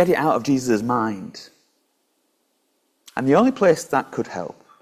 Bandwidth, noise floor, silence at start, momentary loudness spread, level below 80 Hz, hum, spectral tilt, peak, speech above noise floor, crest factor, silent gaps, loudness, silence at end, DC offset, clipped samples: 15.5 kHz; -69 dBFS; 0 s; 16 LU; -62 dBFS; none; -6 dB/octave; -4 dBFS; 49 dB; 18 dB; none; -20 LUFS; 0.3 s; under 0.1%; under 0.1%